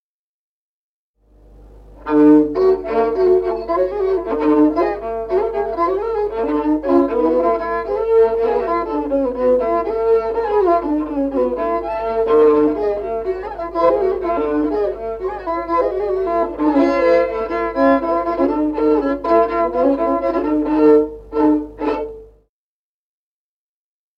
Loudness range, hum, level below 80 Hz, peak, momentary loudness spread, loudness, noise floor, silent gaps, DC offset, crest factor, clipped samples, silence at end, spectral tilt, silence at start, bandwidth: 3 LU; 50 Hz at -40 dBFS; -42 dBFS; -2 dBFS; 8 LU; -17 LUFS; under -90 dBFS; none; under 0.1%; 16 dB; under 0.1%; 1.95 s; -8 dB/octave; 1.6 s; 5.8 kHz